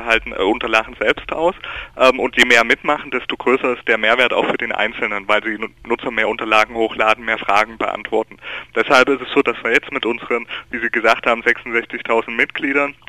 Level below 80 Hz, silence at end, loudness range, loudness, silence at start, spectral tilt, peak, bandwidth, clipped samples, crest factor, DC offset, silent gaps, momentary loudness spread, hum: -46 dBFS; 0.15 s; 3 LU; -17 LUFS; 0 s; -3 dB/octave; 0 dBFS; 14 kHz; under 0.1%; 18 dB; under 0.1%; none; 9 LU; none